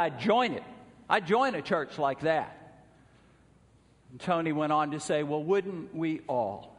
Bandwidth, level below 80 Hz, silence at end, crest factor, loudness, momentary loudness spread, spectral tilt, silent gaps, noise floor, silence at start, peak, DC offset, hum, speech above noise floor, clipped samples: 10.5 kHz; -68 dBFS; 0.05 s; 20 dB; -29 LUFS; 9 LU; -5.5 dB/octave; none; -61 dBFS; 0 s; -10 dBFS; under 0.1%; none; 32 dB; under 0.1%